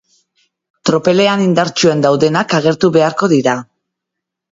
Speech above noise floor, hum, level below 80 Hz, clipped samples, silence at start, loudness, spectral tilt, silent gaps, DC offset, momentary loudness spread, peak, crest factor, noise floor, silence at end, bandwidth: 68 dB; none; -56 dBFS; under 0.1%; 0.85 s; -13 LUFS; -5.5 dB/octave; none; under 0.1%; 5 LU; 0 dBFS; 14 dB; -79 dBFS; 0.95 s; 7.8 kHz